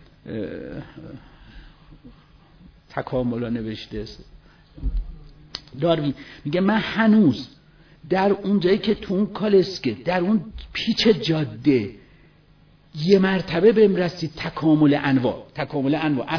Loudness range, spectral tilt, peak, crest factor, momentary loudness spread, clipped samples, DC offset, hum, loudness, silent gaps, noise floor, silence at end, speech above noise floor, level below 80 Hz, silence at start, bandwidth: 11 LU; -7 dB/octave; -4 dBFS; 18 dB; 17 LU; under 0.1%; under 0.1%; none; -21 LUFS; none; -54 dBFS; 0 s; 33 dB; -42 dBFS; 0.25 s; 5.4 kHz